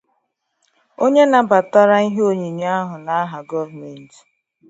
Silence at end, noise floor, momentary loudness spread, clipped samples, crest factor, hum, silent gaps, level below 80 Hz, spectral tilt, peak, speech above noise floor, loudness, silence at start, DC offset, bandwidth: 0.65 s; -70 dBFS; 13 LU; under 0.1%; 18 dB; none; none; -70 dBFS; -6 dB/octave; 0 dBFS; 54 dB; -16 LUFS; 1 s; under 0.1%; 8 kHz